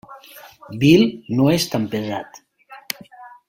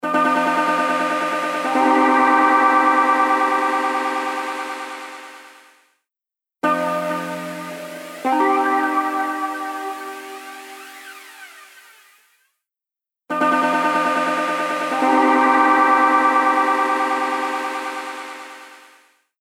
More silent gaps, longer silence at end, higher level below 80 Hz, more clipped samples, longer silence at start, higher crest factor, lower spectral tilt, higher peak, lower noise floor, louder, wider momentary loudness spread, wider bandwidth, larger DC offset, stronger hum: neither; second, 0.2 s vs 0.65 s; first, -54 dBFS vs -78 dBFS; neither; about the same, 0.1 s vs 0.05 s; about the same, 20 dB vs 16 dB; first, -5.5 dB/octave vs -3.5 dB/octave; about the same, 0 dBFS vs -2 dBFS; second, -43 dBFS vs -89 dBFS; about the same, -18 LUFS vs -18 LUFS; first, 24 LU vs 20 LU; about the same, 16.5 kHz vs 16.5 kHz; neither; neither